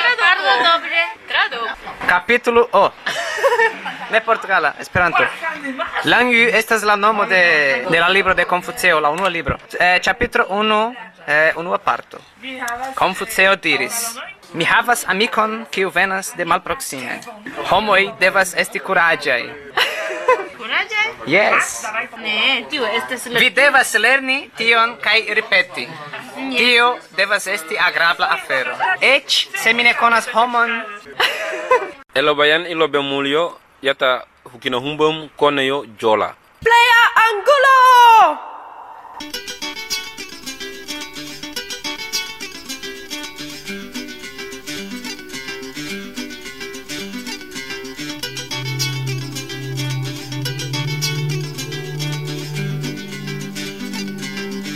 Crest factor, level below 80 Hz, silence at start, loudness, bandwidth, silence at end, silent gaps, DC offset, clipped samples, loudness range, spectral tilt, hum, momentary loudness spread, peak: 16 dB; -50 dBFS; 0 s; -16 LUFS; 16 kHz; 0 s; none; under 0.1%; under 0.1%; 13 LU; -3 dB/octave; none; 16 LU; 0 dBFS